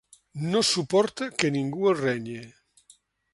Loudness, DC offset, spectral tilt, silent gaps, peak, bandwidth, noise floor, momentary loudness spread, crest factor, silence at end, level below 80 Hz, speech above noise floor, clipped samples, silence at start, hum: -25 LUFS; under 0.1%; -4 dB/octave; none; -4 dBFS; 11.5 kHz; -60 dBFS; 14 LU; 24 dB; 0.85 s; -66 dBFS; 35 dB; under 0.1%; 0.35 s; none